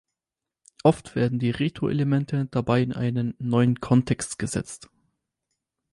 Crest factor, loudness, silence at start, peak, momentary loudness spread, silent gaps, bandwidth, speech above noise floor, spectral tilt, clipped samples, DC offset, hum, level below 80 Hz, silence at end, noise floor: 20 dB; -24 LUFS; 0.85 s; -6 dBFS; 7 LU; none; 11.5 kHz; 65 dB; -6.5 dB/octave; under 0.1%; under 0.1%; none; -54 dBFS; 1.15 s; -89 dBFS